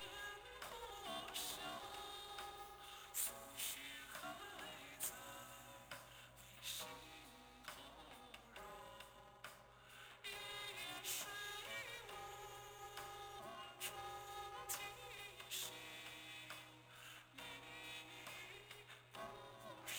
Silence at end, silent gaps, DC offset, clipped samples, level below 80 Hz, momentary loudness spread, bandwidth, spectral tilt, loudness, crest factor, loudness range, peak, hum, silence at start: 0 s; none; under 0.1%; under 0.1%; -74 dBFS; 12 LU; over 20 kHz; -1 dB/octave; -50 LUFS; 24 dB; 6 LU; -28 dBFS; none; 0 s